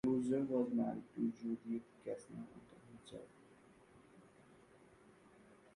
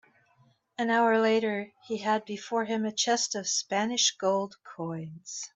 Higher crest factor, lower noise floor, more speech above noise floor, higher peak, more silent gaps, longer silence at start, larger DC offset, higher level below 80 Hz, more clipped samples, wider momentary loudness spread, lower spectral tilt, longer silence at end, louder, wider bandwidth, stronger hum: about the same, 18 dB vs 18 dB; about the same, -65 dBFS vs -66 dBFS; second, 23 dB vs 37 dB; second, -26 dBFS vs -12 dBFS; neither; second, 0.05 s vs 0.8 s; neither; about the same, -76 dBFS vs -78 dBFS; neither; first, 23 LU vs 14 LU; first, -8 dB/octave vs -2.5 dB/octave; first, 1.55 s vs 0.05 s; second, -41 LUFS vs -28 LUFS; first, 11 kHz vs 8.4 kHz; neither